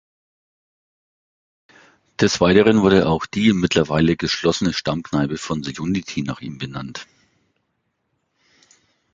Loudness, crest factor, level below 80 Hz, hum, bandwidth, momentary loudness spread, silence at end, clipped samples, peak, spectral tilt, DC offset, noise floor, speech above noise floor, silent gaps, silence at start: -19 LUFS; 20 dB; -46 dBFS; none; 9 kHz; 16 LU; 2.1 s; under 0.1%; -2 dBFS; -5.5 dB/octave; under 0.1%; -72 dBFS; 54 dB; none; 2.2 s